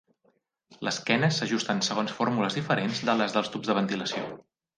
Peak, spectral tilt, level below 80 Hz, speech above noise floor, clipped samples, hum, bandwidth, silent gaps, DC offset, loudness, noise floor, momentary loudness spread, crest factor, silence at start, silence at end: -6 dBFS; -4.5 dB/octave; -70 dBFS; 43 dB; under 0.1%; none; 10 kHz; none; under 0.1%; -27 LUFS; -70 dBFS; 8 LU; 22 dB; 0.7 s; 0.35 s